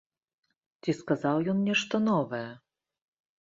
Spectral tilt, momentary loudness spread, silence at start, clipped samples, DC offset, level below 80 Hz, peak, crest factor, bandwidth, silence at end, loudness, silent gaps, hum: -6 dB/octave; 10 LU; 0.85 s; under 0.1%; under 0.1%; -72 dBFS; -12 dBFS; 18 dB; 7.6 kHz; 0.85 s; -29 LUFS; none; none